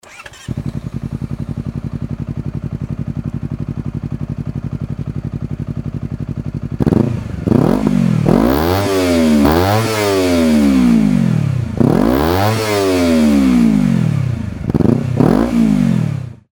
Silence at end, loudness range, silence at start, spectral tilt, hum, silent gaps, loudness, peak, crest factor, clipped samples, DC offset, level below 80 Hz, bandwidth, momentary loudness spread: 0.2 s; 11 LU; 0.1 s; -7 dB/octave; none; none; -15 LUFS; 0 dBFS; 14 dB; under 0.1%; under 0.1%; -32 dBFS; over 20 kHz; 13 LU